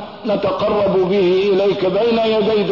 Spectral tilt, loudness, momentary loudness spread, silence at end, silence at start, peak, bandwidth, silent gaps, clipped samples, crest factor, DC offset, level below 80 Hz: -7.5 dB/octave; -16 LUFS; 4 LU; 0 s; 0 s; -8 dBFS; 6 kHz; none; under 0.1%; 8 dB; 0.2%; -50 dBFS